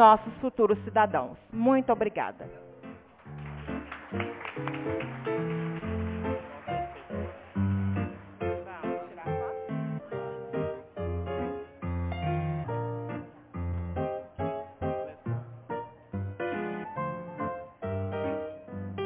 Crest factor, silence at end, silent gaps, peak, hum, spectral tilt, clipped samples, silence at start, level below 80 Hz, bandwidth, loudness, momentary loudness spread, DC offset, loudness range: 24 dB; 0 s; none; -6 dBFS; none; -6.5 dB/octave; under 0.1%; 0 s; -46 dBFS; 4 kHz; -32 LUFS; 13 LU; under 0.1%; 6 LU